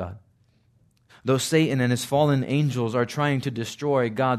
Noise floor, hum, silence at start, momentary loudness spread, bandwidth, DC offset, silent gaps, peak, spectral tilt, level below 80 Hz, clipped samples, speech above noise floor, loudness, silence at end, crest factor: -62 dBFS; none; 0 s; 8 LU; 14 kHz; under 0.1%; none; -8 dBFS; -6 dB/octave; -64 dBFS; under 0.1%; 40 dB; -24 LUFS; 0 s; 16 dB